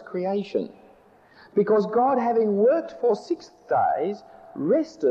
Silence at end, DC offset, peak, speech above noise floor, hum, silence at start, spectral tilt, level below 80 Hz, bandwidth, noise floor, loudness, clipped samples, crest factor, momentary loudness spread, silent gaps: 0 s; under 0.1%; -10 dBFS; 31 dB; none; 0 s; -7.5 dB/octave; -68 dBFS; 7.8 kHz; -54 dBFS; -24 LUFS; under 0.1%; 14 dB; 11 LU; none